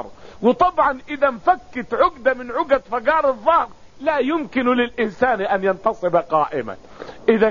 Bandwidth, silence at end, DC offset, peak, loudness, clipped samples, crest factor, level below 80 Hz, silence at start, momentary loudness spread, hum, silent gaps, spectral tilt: 7.2 kHz; 0 s; 0.6%; -4 dBFS; -19 LUFS; under 0.1%; 16 dB; -48 dBFS; 0 s; 9 LU; none; none; -3.5 dB/octave